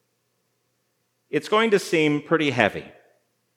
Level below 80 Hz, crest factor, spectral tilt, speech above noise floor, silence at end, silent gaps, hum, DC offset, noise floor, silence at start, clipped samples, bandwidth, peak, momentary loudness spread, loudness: -70 dBFS; 24 dB; -5 dB/octave; 51 dB; 0.65 s; none; none; under 0.1%; -72 dBFS; 1.35 s; under 0.1%; 16 kHz; -2 dBFS; 9 LU; -22 LUFS